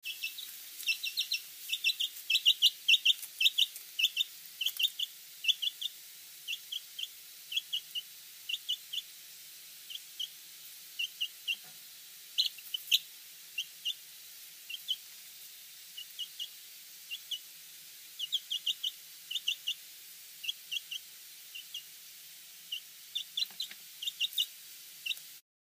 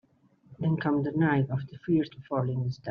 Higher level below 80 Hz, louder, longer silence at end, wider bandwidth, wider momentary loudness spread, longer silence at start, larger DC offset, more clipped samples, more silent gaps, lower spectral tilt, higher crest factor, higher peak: second, under -90 dBFS vs -66 dBFS; second, -33 LUFS vs -29 LUFS; first, 0.25 s vs 0 s; first, 15.5 kHz vs 6.4 kHz; first, 20 LU vs 7 LU; second, 0.05 s vs 0.5 s; neither; neither; neither; second, 4.5 dB/octave vs -7.5 dB/octave; first, 26 dB vs 16 dB; about the same, -12 dBFS vs -12 dBFS